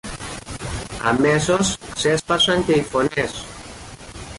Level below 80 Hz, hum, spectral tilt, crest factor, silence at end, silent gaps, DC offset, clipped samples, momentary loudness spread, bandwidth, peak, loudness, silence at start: -40 dBFS; none; -4 dB/octave; 14 dB; 0 s; none; under 0.1%; under 0.1%; 19 LU; 11.5 kHz; -6 dBFS; -19 LUFS; 0.05 s